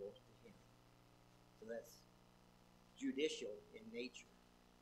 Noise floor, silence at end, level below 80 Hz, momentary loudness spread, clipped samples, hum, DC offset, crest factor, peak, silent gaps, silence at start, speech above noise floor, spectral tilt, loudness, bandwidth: -69 dBFS; 0.05 s; -78 dBFS; 26 LU; under 0.1%; 60 Hz at -70 dBFS; under 0.1%; 22 dB; -28 dBFS; none; 0 s; 22 dB; -3.5 dB/octave; -48 LUFS; 15.5 kHz